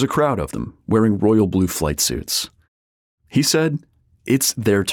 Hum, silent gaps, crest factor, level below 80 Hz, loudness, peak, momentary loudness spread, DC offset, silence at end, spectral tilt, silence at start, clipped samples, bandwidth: none; 2.68-3.18 s; 14 dB; -42 dBFS; -19 LUFS; -6 dBFS; 12 LU; under 0.1%; 0 s; -4.5 dB/octave; 0 s; under 0.1%; 18.5 kHz